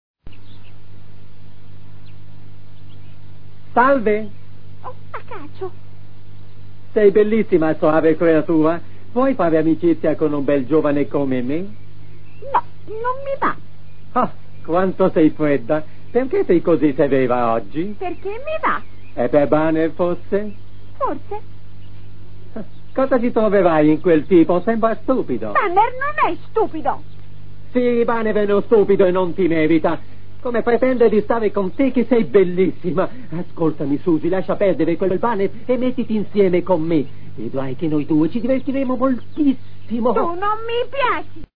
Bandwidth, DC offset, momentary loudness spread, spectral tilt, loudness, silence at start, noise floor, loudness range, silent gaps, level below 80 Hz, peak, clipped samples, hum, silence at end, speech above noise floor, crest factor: 5 kHz; 7%; 13 LU; -10.5 dB/octave; -18 LUFS; 0.15 s; -44 dBFS; 6 LU; none; -48 dBFS; -2 dBFS; under 0.1%; none; 0 s; 26 dB; 18 dB